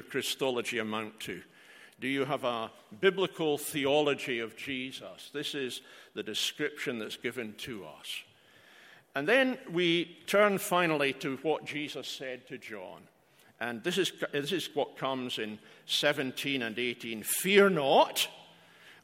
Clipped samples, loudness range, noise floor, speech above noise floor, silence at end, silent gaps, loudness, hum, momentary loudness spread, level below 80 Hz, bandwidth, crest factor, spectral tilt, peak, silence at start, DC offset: under 0.1%; 8 LU; -60 dBFS; 28 dB; 0.1 s; none; -31 LUFS; none; 15 LU; -78 dBFS; 16 kHz; 24 dB; -3.5 dB/octave; -8 dBFS; 0 s; under 0.1%